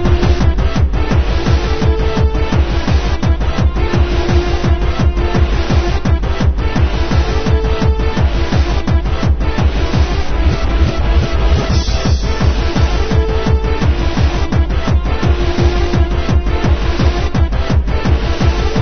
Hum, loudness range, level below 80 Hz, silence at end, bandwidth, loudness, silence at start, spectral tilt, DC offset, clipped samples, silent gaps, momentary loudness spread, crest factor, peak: none; 0 LU; -14 dBFS; 0 s; 6.6 kHz; -15 LUFS; 0 s; -6.5 dB/octave; 0.5%; under 0.1%; none; 2 LU; 12 dB; 0 dBFS